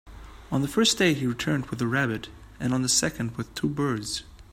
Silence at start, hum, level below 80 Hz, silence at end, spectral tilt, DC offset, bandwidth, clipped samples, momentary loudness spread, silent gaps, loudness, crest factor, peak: 0.05 s; none; -50 dBFS; 0.1 s; -4 dB/octave; under 0.1%; 16 kHz; under 0.1%; 11 LU; none; -26 LUFS; 20 dB; -8 dBFS